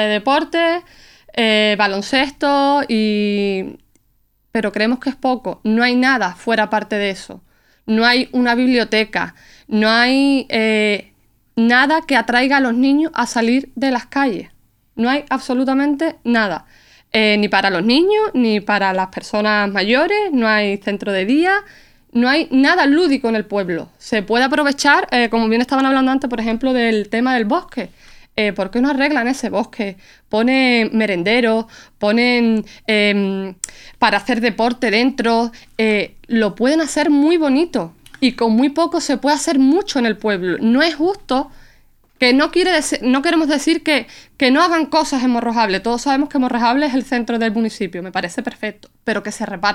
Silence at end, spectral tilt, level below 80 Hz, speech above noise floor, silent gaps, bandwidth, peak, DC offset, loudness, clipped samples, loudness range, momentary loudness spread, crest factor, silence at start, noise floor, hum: 0 s; -4 dB/octave; -48 dBFS; 44 dB; none; 13 kHz; 0 dBFS; under 0.1%; -16 LUFS; under 0.1%; 3 LU; 9 LU; 16 dB; 0 s; -60 dBFS; none